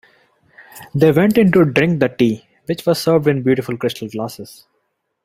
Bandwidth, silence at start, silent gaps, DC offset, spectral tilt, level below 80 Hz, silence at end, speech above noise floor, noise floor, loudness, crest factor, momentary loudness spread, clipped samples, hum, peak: 16 kHz; 0.75 s; none; under 0.1%; -7 dB/octave; -54 dBFS; 0.8 s; 54 dB; -69 dBFS; -16 LUFS; 16 dB; 14 LU; under 0.1%; none; -2 dBFS